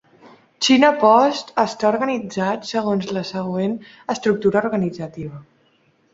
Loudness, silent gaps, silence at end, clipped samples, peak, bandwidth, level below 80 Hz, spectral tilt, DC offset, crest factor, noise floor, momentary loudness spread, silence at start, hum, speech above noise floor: -19 LUFS; none; 0.7 s; under 0.1%; -2 dBFS; 8 kHz; -60 dBFS; -5 dB/octave; under 0.1%; 18 dB; -60 dBFS; 14 LU; 0.25 s; none; 41 dB